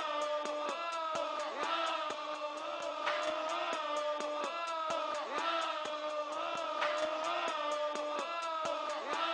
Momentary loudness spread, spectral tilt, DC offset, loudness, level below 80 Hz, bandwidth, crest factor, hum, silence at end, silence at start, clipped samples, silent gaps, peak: 4 LU; -1.5 dB/octave; under 0.1%; -36 LUFS; -82 dBFS; 10.5 kHz; 16 dB; none; 0 s; 0 s; under 0.1%; none; -20 dBFS